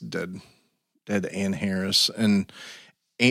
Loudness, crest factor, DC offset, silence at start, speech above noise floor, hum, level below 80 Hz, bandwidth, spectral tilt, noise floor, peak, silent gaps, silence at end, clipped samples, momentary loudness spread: -24 LUFS; 20 dB; under 0.1%; 0 s; 37 dB; none; -66 dBFS; 15.5 kHz; -4 dB/octave; -63 dBFS; -8 dBFS; none; 0 s; under 0.1%; 20 LU